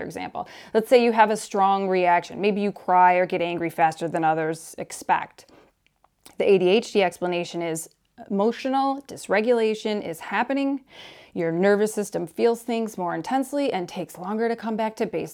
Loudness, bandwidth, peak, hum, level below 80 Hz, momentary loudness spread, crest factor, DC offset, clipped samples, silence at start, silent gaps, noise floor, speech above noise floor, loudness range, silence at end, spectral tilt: -23 LUFS; 17.5 kHz; -4 dBFS; none; -68 dBFS; 14 LU; 18 dB; under 0.1%; under 0.1%; 0 s; none; -65 dBFS; 42 dB; 5 LU; 0 s; -5 dB/octave